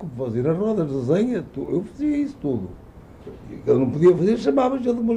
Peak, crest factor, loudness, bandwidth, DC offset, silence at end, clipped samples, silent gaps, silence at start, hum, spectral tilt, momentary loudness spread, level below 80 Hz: -6 dBFS; 16 dB; -22 LUFS; 9.2 kHz; under 0.1%; 0 s; under 0.1%; none; 0 s; none; -8.5 dB/octave; 13 LU; -48 dBFS